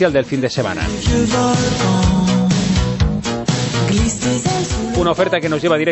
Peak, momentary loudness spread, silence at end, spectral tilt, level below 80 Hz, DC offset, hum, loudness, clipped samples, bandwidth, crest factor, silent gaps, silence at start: -2 dBFS; 4 LU; 0 s; -5 dB/octave; -28 dBFS; under 0.1%; none; -16 LUFS; under 0.1%; 8.4 kHz; 14 dB; none; 0 s